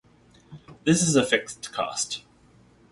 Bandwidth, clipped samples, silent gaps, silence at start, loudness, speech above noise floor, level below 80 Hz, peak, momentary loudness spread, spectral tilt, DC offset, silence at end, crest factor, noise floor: 11.5 kHz; under 0.1%; none; 0.5 s; -24 LUFS; 32 dB; -60 dBFS; -6 dBFS; 12 LU; -3.5 dB/octave; under 0.1%; 0.7 s; 20 dB; -57 dBFS